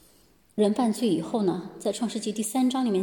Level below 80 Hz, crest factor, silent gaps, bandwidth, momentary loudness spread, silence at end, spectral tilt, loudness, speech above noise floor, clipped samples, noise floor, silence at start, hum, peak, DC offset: -70 dBFS; 14 dB; none; 17.5 kHz; 7 LU; 0 s; -5.5 dB/octave; -26 LUFS; 35 dB; under 0.1%; -60 dBFS; 0.55 s; none; -12 dBFS; under 0.1%